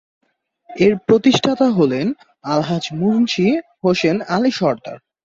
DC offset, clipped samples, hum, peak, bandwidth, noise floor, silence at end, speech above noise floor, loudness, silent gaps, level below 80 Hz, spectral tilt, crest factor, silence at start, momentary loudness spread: under 0.1%; under 0.1%; none; -2 dBFS; 7.8 kHz; -47 dBFS; 0.25 s; 31 dB; -17 LUFS; none; -56 dBFS; -6 dB/octave; 16 dB; 0.7 s; 9 LU